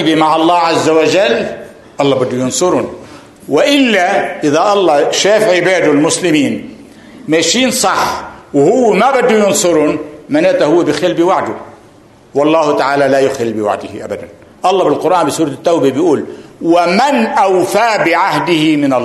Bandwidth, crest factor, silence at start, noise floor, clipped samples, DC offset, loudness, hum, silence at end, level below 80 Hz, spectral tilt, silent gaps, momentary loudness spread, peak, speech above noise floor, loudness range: 12.5 kHz; 12 dB; 0 s; -41 dBFS; under 0.1%; under 0.1%; -11 LUFS; none; 0 s; -52 dBFS; -4 dB/octave; none; 11 LU; 0 dBFS; 31 dB; 3 LU